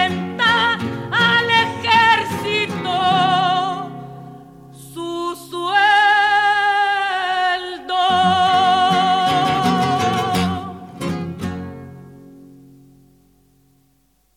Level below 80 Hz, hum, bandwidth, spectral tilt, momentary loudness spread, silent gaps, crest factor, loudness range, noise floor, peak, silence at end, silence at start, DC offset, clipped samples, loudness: -54 dBFS; none; 16 kHz; -4 dB/octave; 15 LU; none; 16 dB; 11 LU; -61 dBFS; -2 dBFS; 1.9 s; 0 s; under 0.1%; under 0.1%; -17 LUFS